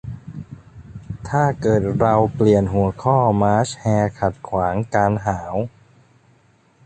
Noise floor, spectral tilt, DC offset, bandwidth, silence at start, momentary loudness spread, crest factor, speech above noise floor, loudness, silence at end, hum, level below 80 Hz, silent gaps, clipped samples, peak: -56 dBFS; -7.5 dB/octave; under 0.1%; 9 kHz; 0.05 s; 19 LU; 18 dB; 38 dB; -19 LUFS; 1.2 s; none; -42 dBFS; none; under 0.1%; -2 dBFS